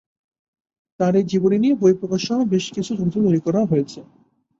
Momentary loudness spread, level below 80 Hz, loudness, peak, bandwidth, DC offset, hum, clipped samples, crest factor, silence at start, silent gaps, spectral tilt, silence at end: 6 LU; -58 dBFS; -19 LUFS; -4 dBFS; 7.8 kHz; under 0.1%; none; under 0.1%; 16 dB; 1 s; none; -7 dB/octave; 0.6 s